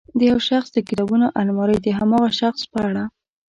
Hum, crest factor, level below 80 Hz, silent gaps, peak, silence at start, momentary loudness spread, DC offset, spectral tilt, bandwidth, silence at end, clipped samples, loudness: none; 14 dB; -50 dBFS; none; -6 dBFS; 0.15 s; 6 LU; under 0.1%; -6.5 dB/octave; 7.8 kHz; 0.4 s; under 0.1%; -19 LUFS